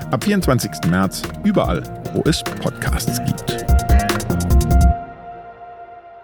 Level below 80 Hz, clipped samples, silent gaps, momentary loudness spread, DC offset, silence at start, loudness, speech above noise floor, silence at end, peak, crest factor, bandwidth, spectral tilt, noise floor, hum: -22 dBFS; under 0.1%; none; 20 LU; under 0.1%; 0 s; -19 LUFS; 19 dB; 0 s; -4 dBFS; 14 dB; 19 kHz; -5.5 dB/octave; -38 dBFS; none